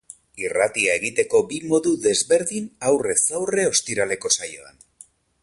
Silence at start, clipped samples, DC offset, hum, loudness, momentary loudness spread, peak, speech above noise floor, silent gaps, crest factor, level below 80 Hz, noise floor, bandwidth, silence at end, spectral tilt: 0.35 s; under 0.1%; under 0.1%; none; -21 LUFS; 8 LU; -6 dBFS; 30 dB; none; 16 dB; -60 dBFS; -51 dBFS; 11.5 kHz; 0.75 s; -2 dB/octave